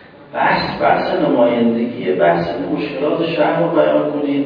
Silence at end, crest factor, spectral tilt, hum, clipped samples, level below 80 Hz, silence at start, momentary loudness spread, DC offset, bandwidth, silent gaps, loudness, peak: 0 s; 16 dB; -8.5 dB/octave; none; under 0.1%; -50 dBFS; 0.2 s; 6 LU; under 0.1%; 5.4 kHz; none; -16 LUFS; 0 dBFS